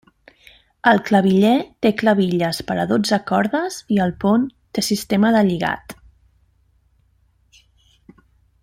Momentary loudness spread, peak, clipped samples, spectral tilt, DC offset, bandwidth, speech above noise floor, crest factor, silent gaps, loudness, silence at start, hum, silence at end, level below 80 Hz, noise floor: 8 LU; -2 dBFS; under 0.1%; -5.5 dB/octave; under 0.1%; 16 kHz; 42 dB; 18 dB; none; -18 LUFS; 0.85 s; none; 2.7 s; -54 dBFS; -60 dBFS